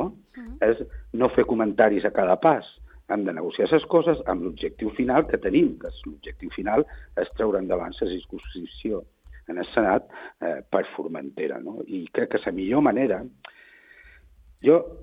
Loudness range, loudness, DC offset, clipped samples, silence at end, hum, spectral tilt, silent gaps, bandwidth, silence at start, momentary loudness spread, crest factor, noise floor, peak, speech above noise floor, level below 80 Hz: 6 LU; -24 LUFS; under 0.1%; under 0.1%; 0 s; none; -9 dB/octave; none; 5 kHz; 0 s; 16 LU; 20 dB; -53 dBFS; -4 dBFS; 29 dB; -48 dBFS